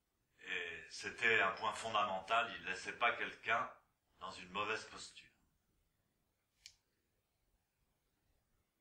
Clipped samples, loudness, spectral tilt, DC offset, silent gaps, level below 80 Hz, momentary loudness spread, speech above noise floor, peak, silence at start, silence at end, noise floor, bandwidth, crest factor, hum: under 0.1%; -38 LUFS; -2 dB/octave; under 0.1%; none; -78 dBFS; 18 LU; 44 dB; -20 dBFS; 0.4 s; 2.1 s; -84 dBFS; 15.5 kHz; 24 dB; none